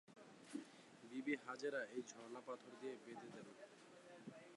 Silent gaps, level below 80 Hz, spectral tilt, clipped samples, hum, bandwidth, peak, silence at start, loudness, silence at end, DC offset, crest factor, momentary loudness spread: none; under -90 dBFS; -4 dB/octave; under 0.1%; none; 11.5 kHz; -30 dBFS; 0.1 s; -51 LUFS; 0 s; under 0.1%; 22 dB; 16 LU